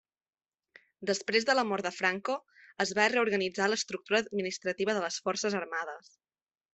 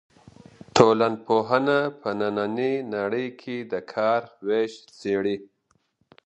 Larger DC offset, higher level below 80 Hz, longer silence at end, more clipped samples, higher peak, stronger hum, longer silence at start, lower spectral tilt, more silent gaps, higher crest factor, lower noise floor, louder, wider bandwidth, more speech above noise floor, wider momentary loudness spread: neither; second, -76 dBFS vs -62 dBFS; about the same, 0.75 s vs 0.8 s; neither; second, -10 dBFS vs 0 dBFS; neither; first, 1 s vs 0.75 s; second, -3 dB/octave vs -5.5 dB/octave; neither; about the same, 22 dB vs 24 dB; second, -62 dBFS vs -69 dBFS; second, -30 LUFS vs -24 LUFS; about the same, 8.4 kHz vs 8.6 kHz; second, 31 dB vs 45 dB; about the same, 10 LU vs 12 LU